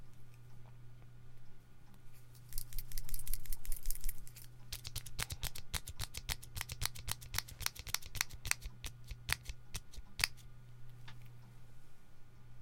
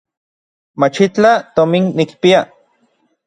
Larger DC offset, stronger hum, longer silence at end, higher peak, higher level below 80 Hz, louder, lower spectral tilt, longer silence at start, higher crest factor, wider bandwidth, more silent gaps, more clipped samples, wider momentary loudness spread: neither; neither; second, 0 s vs 0.85 s; second, -8 dBFS vs 0 dBFS; first, -48 dBFS vs -58 dBFS; second, -42 LUFS vs -13 LUFS; second, -1 dB/octave vs -6 dB/octave; second, 0 s vs 0.8 s; first, 32 dB vs 16 dB; first, 17 kHz vs 10 kHz; neither; neither; first, 22 LU vs 5 LU